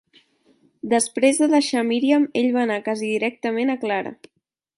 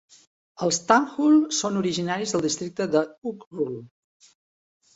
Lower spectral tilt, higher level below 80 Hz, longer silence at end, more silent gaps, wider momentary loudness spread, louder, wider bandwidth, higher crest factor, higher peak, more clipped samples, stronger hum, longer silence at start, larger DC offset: about the same, -3.5 dB/octave vs -4 dB/octave; about the same, -72 dBFS vs -68 dBFS; second, 0.65 s vs 1.1 s; second, none vs 3.18-3.22 s, 3.46-3.51 s; second, 7 LU vs 12 LU; first, -21 LUFS vs -24 LUFS; first, 11.5 kHz vs 8.2 kHz; second, 16 dB vs 22 dB; about the same, -4 dBFS vs -2 dBFS; neither; neither; first, 0.85 s vs 0.6 s; neither